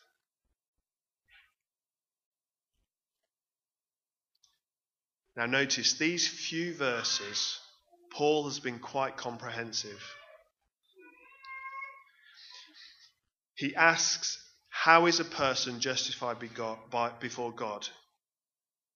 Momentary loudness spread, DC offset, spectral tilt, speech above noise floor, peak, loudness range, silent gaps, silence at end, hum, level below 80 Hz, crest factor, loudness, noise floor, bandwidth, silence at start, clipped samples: 20 LU; under 0.1%; -2 dB/octave; over 59 dB; -6 dBFS; 15 LU; none; 1 s; none; -76 dBFS; 28 dB; -30 LUFS; under -90 dBFS; 7.4 kHz; 5.35 s; under 0.1%